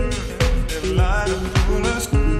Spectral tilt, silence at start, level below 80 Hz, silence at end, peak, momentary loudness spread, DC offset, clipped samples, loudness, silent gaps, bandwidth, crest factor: -5 dB/octave; 0 s; -22 dBFS; 0 s; -4 dBFS; 3 LU; under 0.1%; under 0.1%; -21 LUFS; none; 14 kHz; 14 dB